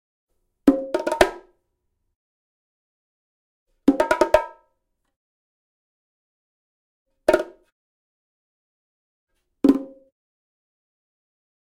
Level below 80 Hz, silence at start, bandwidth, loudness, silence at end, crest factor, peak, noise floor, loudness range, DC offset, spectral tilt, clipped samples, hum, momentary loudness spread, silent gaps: -50 dBFS; 0.65 s; 16 kHz; -21 LUFS; 1.75 s; 26 dB; 0 dBFS; -74 dBFS; 5 LU; under 0.1%; -4.5 dB/octave; under 0.1%; none; 7 LU; 2.15-3.66 s, 5.16-7.06 s, 7.72-9.27 s